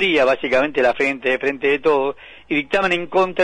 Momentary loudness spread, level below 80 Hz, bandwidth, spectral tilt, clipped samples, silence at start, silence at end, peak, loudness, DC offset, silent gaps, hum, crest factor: 6 LU; -52 dBFS; 10.5 kHz; -5 dB/octave; under 0.1%; 0 s; 0 s; -6 dBFS; -18 LUFS; under 0.1%; none; none; 12 dB